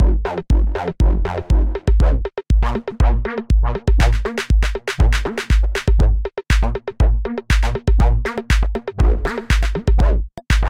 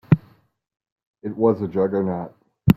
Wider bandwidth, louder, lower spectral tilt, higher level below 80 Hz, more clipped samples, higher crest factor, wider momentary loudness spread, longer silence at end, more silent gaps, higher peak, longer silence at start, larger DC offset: second, 9.8 kHz vs 15.5 kHz; first, -19 LUFS vs -22 LUFS; second, -6 dB/octave vs -9.5 dB/octave; first, -16 dBFS vs -46 dBFS; neither; second, 12 dB vs 22 dB; second, 5 LU vs 14 LU; about the same, 0 s vs 0 s; second, none vs 0.92-0.96 s, 1.07-1.14 s; second, -4 dBFS vs 0 dBFS; about the same, 0 s vs 0.1 s; neither